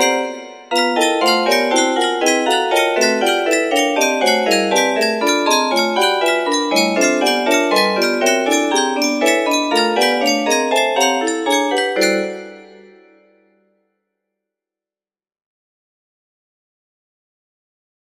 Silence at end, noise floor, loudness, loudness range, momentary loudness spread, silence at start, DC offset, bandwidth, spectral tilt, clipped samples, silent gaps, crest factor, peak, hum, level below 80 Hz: 5.55 s; under -90 dBFS; -15 LUFS; 5 LU; 3 LU; 0 s; under 0.1%; 15.5 kHz; -2 dB/octave; under 0.1%; none; 16 dB; 0 dBFS; none; -68 dBFS